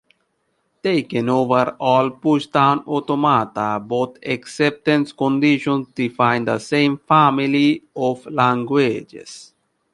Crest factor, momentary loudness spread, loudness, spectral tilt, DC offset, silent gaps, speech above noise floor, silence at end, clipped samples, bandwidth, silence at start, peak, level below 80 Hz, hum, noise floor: 18 dB; 8 LU; -18 LUFS; -6.5 dB/octave; under 0.1%; none; 50 dB; 0.5 s; under 0.1%; 11.5 kHz; 0.85 s; -2 dBFS; -62 dBFS; none; -69 dBFS